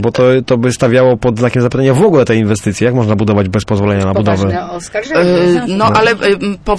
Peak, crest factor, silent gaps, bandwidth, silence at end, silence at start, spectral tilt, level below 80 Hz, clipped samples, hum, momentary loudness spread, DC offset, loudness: 0 dBFS; 10 dB; none; 11 kHz; 0 s; 0 s; -6.5 dB/octave; -36 dBFS; under 0.1%; none; 5 LU; under 0.1%; -11 LUFS